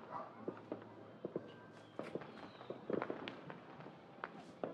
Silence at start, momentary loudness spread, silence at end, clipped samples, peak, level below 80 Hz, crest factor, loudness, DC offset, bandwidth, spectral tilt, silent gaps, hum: 0 s; 12 LU; 0 s; under 0.1%; -24 dBFS; -86 dBFS; 24 dB; -49 LUFS; under 0.1%; 11 kHz; -7 dB/octave; none; none